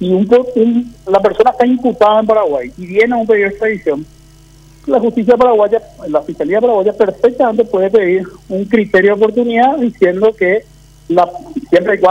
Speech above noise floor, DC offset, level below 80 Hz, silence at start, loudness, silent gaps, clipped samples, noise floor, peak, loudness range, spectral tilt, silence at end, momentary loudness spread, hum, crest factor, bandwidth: 29 dB; under 0.1%; -46 dBFS; 0 s; -12 LUFS; none; under 0.1%; -41 dBFS; 0 dBFS; 2 LU; -7 dB/octave; 0 s; 8 LU; none; 12 dB; 9.2 kHz